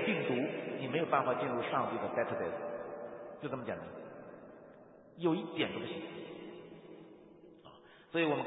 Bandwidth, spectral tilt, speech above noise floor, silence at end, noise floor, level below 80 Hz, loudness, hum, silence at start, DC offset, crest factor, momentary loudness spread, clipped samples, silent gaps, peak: 3.9 kHz; -2.5 dB/octave; 23 dB; 0 s; -58 dBFS; -76 dBFS; -37 LUFS; none; 0 s; under 0.1%; 22 dB; 24 LU; under 0.1%; none; -16 dBFS